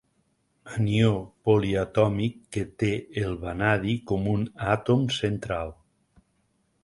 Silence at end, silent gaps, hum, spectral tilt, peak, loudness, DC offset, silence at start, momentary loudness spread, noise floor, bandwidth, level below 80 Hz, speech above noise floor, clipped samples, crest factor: 1.1 s; none; none; -7 dB/octave; -8 dBFS; -26 LUFS; under 0.1%; 0.65 s; 9 LU; -70 dBFS; 11.5 kHz; -48 dBFS; 45 dB; under 0.1%; 20 dB